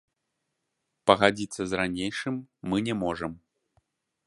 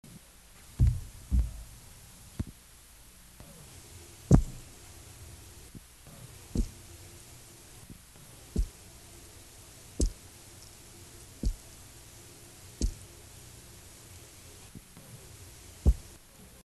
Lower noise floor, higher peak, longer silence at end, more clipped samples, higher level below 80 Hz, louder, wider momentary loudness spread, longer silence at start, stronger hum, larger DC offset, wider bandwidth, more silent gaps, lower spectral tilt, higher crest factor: first, -81 dBFS vs -54 dBFS; about the same, -2 dBFS vs -4 dBFS; first, 0.9 s vs 0.65 s; neither; second, -58 dBFS vs -38 dBFS; first, -27 LUFS vs -33 LUFS; second, 13 LU vs 21 LU; first, 1.05 s vs 0.15 s; neither; neither; second, 11.5 kHz vs 13 kHz; neither; about the same, -5 dB/octave vs -6 dB/octave; about the same, 28 dB vs 30 dB